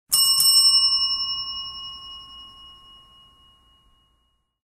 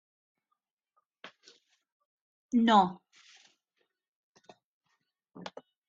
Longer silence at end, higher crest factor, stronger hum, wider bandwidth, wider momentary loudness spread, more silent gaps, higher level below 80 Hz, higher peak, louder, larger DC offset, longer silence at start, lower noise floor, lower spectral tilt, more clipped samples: first, 1.95 s vs 0.4 s; second, 18 dB vs 24 dB; neither; first, 16 kHz vs 7.4 kHz; second, 24 LU vs 27 LU; second, none vs 1.92-2.49 s, 4.08-4.34 s, 4.64-4.81 s; first, -58 dBFS vs -80 dBFS; first, -6 dBFS vs -10 dBFS; first, -16 LUFS vs -26 LUFS; neither; second, 0.1 s vs 1.25 s; second, -69 dBFS vs -84 dBFS; second, 3 dB/octave vs -5.5 dB/octave; neither